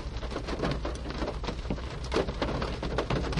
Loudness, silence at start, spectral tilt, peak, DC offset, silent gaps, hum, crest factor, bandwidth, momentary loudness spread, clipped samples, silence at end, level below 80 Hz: -33 LUFS; 0 s; -6 dB/octave; -14 dBFS; under 0.1%; none; none; 18 dB; 11 kHz; 5 LU; under 0.1%; 0 s; -36 dBFS